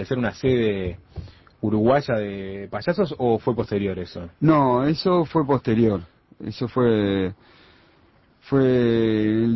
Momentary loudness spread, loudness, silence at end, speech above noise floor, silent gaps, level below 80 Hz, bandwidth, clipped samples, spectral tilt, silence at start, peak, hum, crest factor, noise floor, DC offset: 13 LU; -22 LUFS; 0 s; 36 dB; none; -46 dBFS; 6 kHz; under 0.1%; -8.5 dB/octave; 0 s; -6 dBFS; none; 16 dB; -57 dBFS; under 0.1%